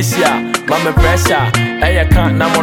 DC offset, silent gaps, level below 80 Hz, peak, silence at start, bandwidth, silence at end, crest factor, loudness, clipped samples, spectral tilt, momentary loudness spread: under 0.1%; none; -20 dBFS; 0 dBFS; 0 s; 17.5 kHz; 0 s; 12 dB; -12 LUFS; under 0.1%; -5 dB/octave; 3 LU